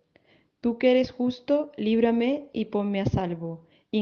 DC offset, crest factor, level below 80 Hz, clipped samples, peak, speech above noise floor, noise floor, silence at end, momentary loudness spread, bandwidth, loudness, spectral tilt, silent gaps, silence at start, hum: under 0.1%; 16 dB; -54 dBFS; under 0.1%; -10 dBFS; 37 dB; -62 dBFS; 0 s; 10 LU; 6.8 kHz; -26 LUFS; -8 dB/octave; none; 0.65 s; none